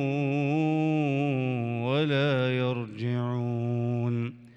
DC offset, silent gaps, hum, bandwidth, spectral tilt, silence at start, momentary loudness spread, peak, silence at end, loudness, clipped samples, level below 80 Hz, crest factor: under 0.1%; none; none; 7.4 kHz; -8.5 dB/octave; 0 s; 5 LU; -16 dBFS; 0.1 s; -28 LUFS; under 0.1%; -72 dBFS; 12 dB